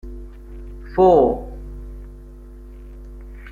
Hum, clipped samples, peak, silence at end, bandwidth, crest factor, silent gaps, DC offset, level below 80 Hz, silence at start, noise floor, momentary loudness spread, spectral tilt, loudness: 50 Hz at -35 dBFS; under 0.1%; -2 dBFS; 0 s; 7.2 kHz; 20 dB; none; under 0.1%; -36 dBFS; 0.05 s; -38 dBFS; 28 LU; -9 dB/octave; -17 LUFS